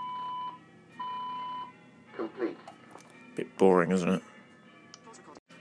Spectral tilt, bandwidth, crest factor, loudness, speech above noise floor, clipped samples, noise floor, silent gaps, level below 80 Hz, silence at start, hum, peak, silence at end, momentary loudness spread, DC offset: -6.5 dB/octave; 10.5 kHz; 24 dB; -31 LUFS; 28 dB; under 0.1%; -55 dBFS; 5.39-5.46 s; -80 dBFS; 0 s; none; -10 dBFS; 0 s; 27 LU; under 0.1%